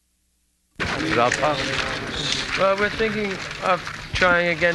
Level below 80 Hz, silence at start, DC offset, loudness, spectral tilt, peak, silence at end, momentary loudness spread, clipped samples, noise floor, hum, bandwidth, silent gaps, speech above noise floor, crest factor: -44 dBFS; 0.8 s; under 0.1%; -22 LUFS; -3.5 dB/octave; -4 dBFS; 0 s; 8 LU; under 0.1%; -67 dBFS; none; 12 kHz; none; 46 dB; 20 dB